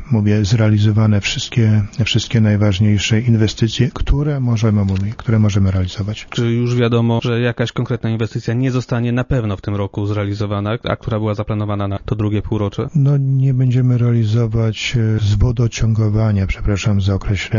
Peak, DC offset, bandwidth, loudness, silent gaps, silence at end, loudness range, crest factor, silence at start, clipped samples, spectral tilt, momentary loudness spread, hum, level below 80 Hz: -2 dBFS; under 0.1%; 7.4 kHz; -17 LUFS; none; 0 s; 4 LU; 14 dB; 0 s; under 0.1%; -6.5 dB/octave; 6 LU; none; -30 dBFS